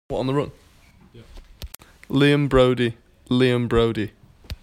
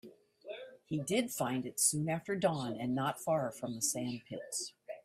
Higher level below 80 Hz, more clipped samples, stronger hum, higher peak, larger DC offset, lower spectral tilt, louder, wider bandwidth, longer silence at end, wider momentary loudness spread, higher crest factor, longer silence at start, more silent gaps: first, -40 dBFS vs -74 dBFS; neither; neither; first, -4 dBFS vs -16 dBFS; neither; first, -7 dB/octave vs -4 dB/octave; first, -20 LUFS vs -35 LUFS; about the same, 16.5 kHz vs 16 kHz; about the same, 0.1 s vs 0.05 s; first, 23 LU vs 14 LU; about the same, 18 dB vs 20 dB; about the same, 0.1 s vs 0.05 s; neither